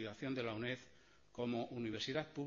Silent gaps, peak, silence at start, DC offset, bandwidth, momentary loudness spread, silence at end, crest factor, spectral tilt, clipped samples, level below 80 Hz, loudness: none; -24 dBFS; 0 s; under 0.1%; 7.4 kHz; 5 LU; 0 s; 18 dB; -4 dB/octave; under 0.1%; -74 dBFS; -43 LUFS